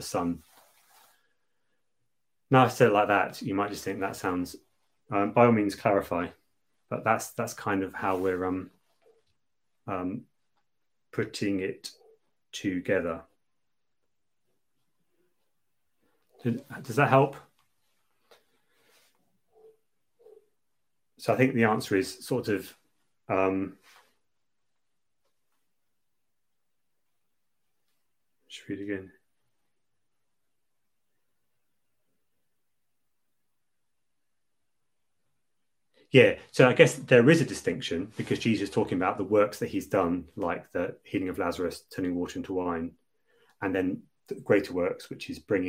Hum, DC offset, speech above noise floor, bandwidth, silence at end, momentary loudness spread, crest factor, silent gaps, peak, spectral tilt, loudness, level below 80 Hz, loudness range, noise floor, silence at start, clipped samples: none; under 0.1%; 59 dB; 16.5 kHz; 0 s; 16 LU; 28 dB; none; -2 dBFS; -6 dB/octave; -27 LUFS; -68 dBFS; 20 LU; -86 dBFS; 0 s; under 0.1%